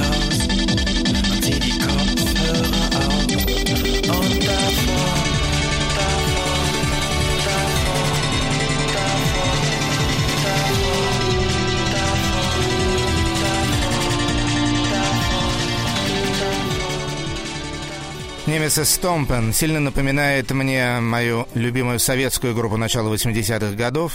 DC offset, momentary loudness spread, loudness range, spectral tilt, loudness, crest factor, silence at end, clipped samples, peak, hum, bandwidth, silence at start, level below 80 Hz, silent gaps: under 0.1%; 3 LU; 2 LU; -4 dB/octave; -19 LUFS; 14 dB; 0 s; under 0.1%; -4 dBFS; none; 16.5 kHz; 0 s; -28 dBFS; none